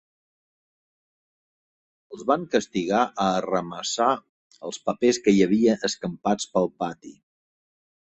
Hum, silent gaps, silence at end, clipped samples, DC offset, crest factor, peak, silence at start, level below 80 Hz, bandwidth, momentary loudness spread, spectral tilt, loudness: none; 4.29-4.50 s; 0.9 s; under 0.1%; under 0.1%; 20 dB; -6 dBFS; 2.1 s; -62 dBFS; 8.6 kHz; 12 LU; -4.5 dB/octave; -24 LUFS